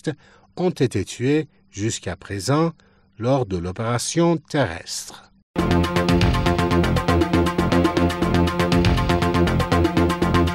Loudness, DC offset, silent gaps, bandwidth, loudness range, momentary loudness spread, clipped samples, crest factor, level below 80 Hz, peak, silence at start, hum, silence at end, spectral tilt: -21 LUFS; under 0.1%; 5.43-5.54 s; 16 kHz; 5 LU; 10 LU; under 0.1%; 14 dB; -34 dBFS; -6 dBFS; 0.05 s; none; 0 s; -6 dB/octave